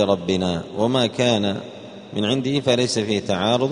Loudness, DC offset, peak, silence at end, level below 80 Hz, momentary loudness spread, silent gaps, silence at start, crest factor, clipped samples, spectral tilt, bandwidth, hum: -21 LUFS; under 0.1%; -4 dBFS; 0 s; -56 dBFS; 10 LU; none; 0 s; 16 dB; under 0.1%; -5 dB/octave; 10.5 kHz; none